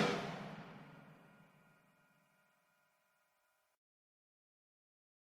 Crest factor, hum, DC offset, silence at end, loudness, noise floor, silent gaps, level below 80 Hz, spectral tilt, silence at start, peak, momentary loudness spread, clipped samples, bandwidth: 28 dB; none; under 0.1%; 3.95 s; -45 LUFS; -81 dBFS; none; -82 dBFS; -5 dB/octave; 0 s; -22 dBFS; 24 LU; under 0.1%; 15.5 kHz